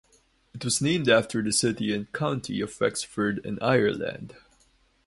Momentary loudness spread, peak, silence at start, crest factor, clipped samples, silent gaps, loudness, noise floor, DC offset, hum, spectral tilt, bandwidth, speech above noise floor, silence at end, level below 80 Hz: 11 LU; -6 dBFS; 0.55 s; 20 dB; under 0.1%; none; -26 LUFS; -64 dBFS; under 0.1%; none; -4 dB/octave; 12 kHz; 38 dB; 0.75 s; -58 dBFS